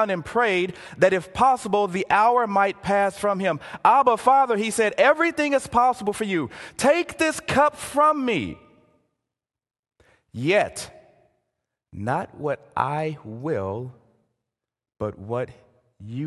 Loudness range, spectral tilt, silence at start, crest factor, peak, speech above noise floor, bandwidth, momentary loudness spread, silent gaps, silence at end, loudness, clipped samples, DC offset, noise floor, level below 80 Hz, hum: 10 LU; -5 dB/octave; 0 s; 20 dB; -2 dBFS; 65 dB; 12.5 kHz; 14 LU; 9.79-9.83 s; 0 s; -22 LUFS; under 0.1%; under 0.1%; -87 dBFS; -56 dBFS; none